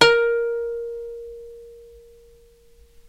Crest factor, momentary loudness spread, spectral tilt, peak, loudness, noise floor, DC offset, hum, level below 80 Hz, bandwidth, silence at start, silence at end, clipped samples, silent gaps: 24 dB; 25 LU; -2.5 dB/octave; 0 dBFS; -23 LUFS; -52 dBFS; under 0.1%; none; -52 dBFS; 11.5 kHz; 0 s; 1.25 s; under 0.1%; none